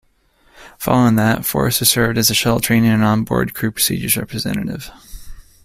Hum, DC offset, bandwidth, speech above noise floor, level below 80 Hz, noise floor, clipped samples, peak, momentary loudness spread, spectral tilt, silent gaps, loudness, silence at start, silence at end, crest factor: none; under 0.1%; 16 kHz; 40 dB; -40 dBFS; -56 dBFS; under 0.1%; 0 dBFS; 10 LU; -4 dB/octave; none; -16 LUFS; 0.6 s; 0.25 s; 18 dB